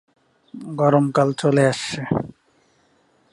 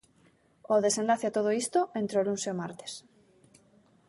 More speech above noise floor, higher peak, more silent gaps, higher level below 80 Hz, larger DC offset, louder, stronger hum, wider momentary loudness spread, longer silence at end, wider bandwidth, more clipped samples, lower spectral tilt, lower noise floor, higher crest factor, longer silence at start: first, 42 dB vs 36 dB; first, -2 dBFS vs -12 dBFS; neither; first, -56 dBFS vs -76 dBFS; neither; first, -20 LUFS vs -29 LUFS; neither; about the same, 16 LU vs 14 LU; about the same, 1.05 s vs 1.1 s; about the same, 11.5 kHz vs 11.5 kHz; neither; first, -6 dB/octave vs -4 dB/octave; second, -61 dBFS vs -65 dBFS; about the same, 20 dB vs 18 dB; about the same, 0.55 s vs 0.65 s